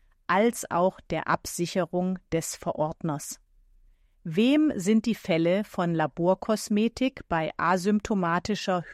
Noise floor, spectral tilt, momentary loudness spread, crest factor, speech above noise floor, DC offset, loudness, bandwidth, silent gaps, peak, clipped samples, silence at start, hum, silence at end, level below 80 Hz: -59 dBFS; -5.5 dB/octave; 8 LU; 16 dB; 33 dB; under 0.1%; -27 LUFS; 15 kHz; none; -10 dBFS; under 0.1%; 0.3 s; none; 0 s; -56 dBFS